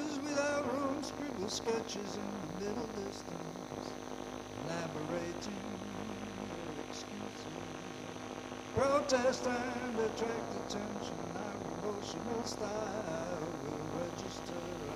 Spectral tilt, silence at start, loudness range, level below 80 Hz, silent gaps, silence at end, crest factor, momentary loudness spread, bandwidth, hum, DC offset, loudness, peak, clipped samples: -4.5 dB/octave; 0 s; 6 LU; -62 dBFS; none; 0 s; 20 dB; 10 LU; 15.5 kHz; none; under 0.1%; -39 LUFS; -18 dBFS; under 0.1%